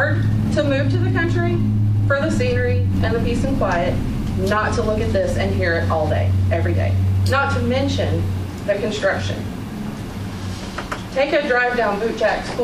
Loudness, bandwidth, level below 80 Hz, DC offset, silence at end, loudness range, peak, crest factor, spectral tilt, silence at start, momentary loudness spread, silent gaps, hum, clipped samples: -20 LUFS; 12.5 kHz; -32 dBFS; under 0.1%; 0 s; 4 LU; -6 dBFS; 14 dB; -7 dB/octave; 0 s; 10 LU; none; none; under 0.1%